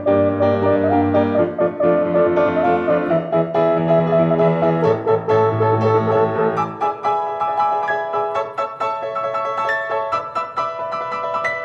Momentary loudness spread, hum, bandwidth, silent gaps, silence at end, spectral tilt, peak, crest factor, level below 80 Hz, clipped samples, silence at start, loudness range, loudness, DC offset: 7 LU; none; 7.6 kHz; none; 0 s; -8.5 dB/octave; -4 dBFS; 14 dB; -58 dBFS; under 0.1%; 0 s; 5 LU; -18 LUFS; under 0.1%